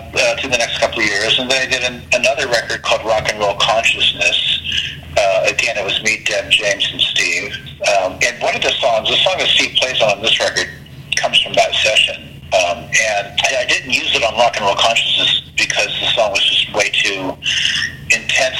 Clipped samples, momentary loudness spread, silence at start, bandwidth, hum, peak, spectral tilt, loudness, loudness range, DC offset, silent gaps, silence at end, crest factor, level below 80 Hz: under 0.1%; 5 LU; 0 s; 16.5 kHz; none; 0 dBFS; -1 dB/octave; -14 LUFS; 2 LU; under 0.1%; none; 0 s; 16 dB; -44 dBFS